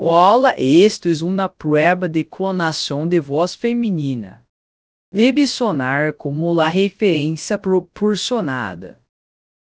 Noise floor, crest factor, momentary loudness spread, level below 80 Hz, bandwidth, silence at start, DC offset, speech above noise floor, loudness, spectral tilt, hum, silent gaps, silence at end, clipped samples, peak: under -90 dBFS; 18 dB; 9 LU; -58 dBFS; 8 kHz; 0 s; under 0.1%; over 73 dB; -17 LUFS; -5.5 dB/octave; none; 4.49-5.12 s; 0.75 s; under 0.1%; 0 dBFS